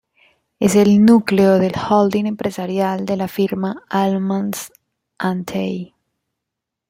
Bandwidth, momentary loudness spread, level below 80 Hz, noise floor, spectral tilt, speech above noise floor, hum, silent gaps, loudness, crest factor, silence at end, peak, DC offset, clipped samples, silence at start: 16 kHz; 13 LU; -56 dBFS; -81 dBFS; -6.5 dB/octave; 65 dB; none; none; -17 LUFS; 16 dB; 1.05 s; -2 dBFS; under 0.1%; under 0.1%; 0.6 s